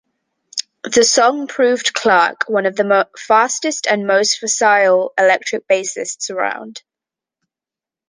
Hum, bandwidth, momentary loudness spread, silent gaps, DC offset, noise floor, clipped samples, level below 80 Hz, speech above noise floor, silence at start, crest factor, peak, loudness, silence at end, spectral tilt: none; 10.5 kHz; 11 LU; none; under 0.1%; -88 dBFS; under 0.1%; -66 dBFS; 73 dB; 0.55 s; 16 dB; -2 dBFS; -15 LUFS; 1.3 s; -1.5 dB/octave